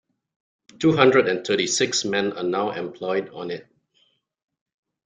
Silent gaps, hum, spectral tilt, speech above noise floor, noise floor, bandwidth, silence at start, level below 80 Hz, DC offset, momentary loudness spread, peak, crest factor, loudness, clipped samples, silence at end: none; none; -3.5 dB/octave; 44 dB; -66 dBFS; 9.6 kHz; 0.8 s; -64 dBFS; under 0.1%; 15 LU; -2 dBFS; 22 dB; -22 LUFS; under 0.1%; 1.45 s